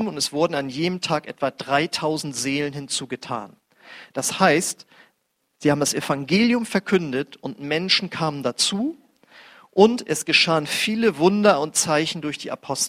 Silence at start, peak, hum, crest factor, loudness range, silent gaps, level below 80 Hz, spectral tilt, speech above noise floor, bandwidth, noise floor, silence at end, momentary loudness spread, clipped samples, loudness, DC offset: 0 s; -2 dBFS; none; 22 dB; 6 LU; none; -64 dBFS; -3.5 dB/octave; 50 dB; 16 kHz; -72 dBFS; 0 s; 11 LU; under 0.1%; -21 LUFS; under 0.1%